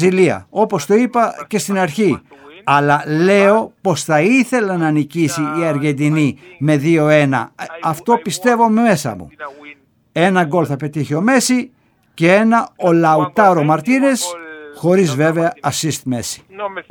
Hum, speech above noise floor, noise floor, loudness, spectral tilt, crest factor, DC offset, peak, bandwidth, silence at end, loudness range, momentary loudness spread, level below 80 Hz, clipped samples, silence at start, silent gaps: none; 27 dB; -42 dBFS; -15 LUFS; -5.5 dB/octave; 16 dB; under 0.1%; 0 dBFS; 19.5 kHz; 0.1 s; 3 LU; 11 LU; -58 dBFS; under 0.1%; 0 s; none